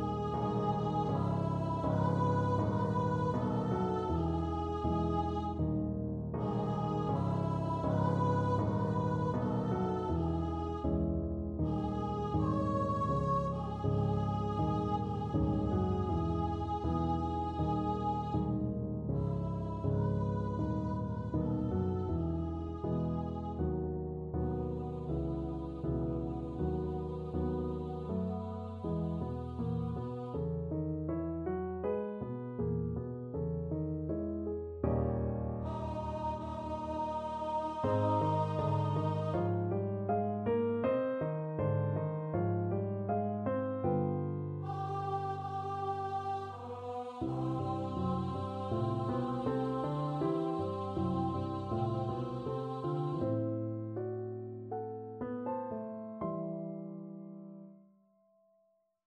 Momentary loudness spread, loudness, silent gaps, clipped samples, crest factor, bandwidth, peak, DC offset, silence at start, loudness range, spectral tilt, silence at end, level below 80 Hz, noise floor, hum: 7 LU; -35 LUFS; none; under 0.1%; 16 dB; 8.4 kHz; -18 dBFS; under 0.1%; 0 s; 5 LU; -9.5 dB/octave; 1.25 s; -48 dBFS; -75 dBFS; none